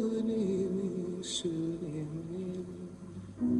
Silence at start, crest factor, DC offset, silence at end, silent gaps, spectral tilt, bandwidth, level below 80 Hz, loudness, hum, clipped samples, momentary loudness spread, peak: 0 s; 14 dB; under 0.1%; 0 s; none; -6 dB/octave; 11 kHz; -62 dBFS; -35 LUFS; none; under 0.1%; 13 LU; -20 dBFS